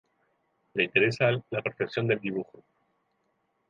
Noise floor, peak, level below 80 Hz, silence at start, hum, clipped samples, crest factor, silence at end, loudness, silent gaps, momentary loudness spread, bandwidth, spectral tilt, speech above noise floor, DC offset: -75 dBFS; -6 dBFS; -70 dBFS; 0.75 s; none; under 0.1%; 24 dB; 1.25 s; -28 LUFS; none; 11 LU; 9.4 kHz; -6.5 dB/octave; 47 dB; under 0.1%